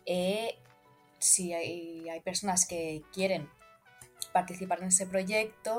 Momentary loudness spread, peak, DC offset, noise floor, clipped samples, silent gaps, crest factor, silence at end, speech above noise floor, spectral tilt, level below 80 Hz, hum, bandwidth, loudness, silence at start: 15 LU; -10 dBFS; under 0.1%; -62 dBFS; under 0.1%; none; 24 dB; 0 s; 31 dB; -2.5 dB/octave; -68 dBFS; none; 16.5 kHz; -30 LUFS; 0.05 s